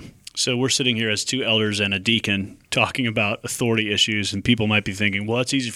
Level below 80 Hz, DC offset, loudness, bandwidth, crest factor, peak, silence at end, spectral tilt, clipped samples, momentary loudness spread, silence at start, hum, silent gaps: -52 dBFS; under 0.1%; -21 LUFS; 16 kHz; 18 dB; -4 dBFS; 0 s; -3.5 dB/octave; under 0.1%; 5 LU; 0 s; none; none